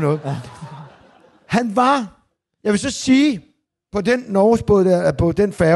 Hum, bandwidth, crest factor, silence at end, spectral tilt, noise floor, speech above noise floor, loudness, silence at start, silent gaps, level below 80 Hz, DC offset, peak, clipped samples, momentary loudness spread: none; 12 kHz; 14 dB; 0 s; -6 dB/octave; -50 dBFS; 34 dB; -17 LUFS; 0 s; none; -42 dBFS; under 0.1%; -4 dBFS; under 0.1%; 15 LU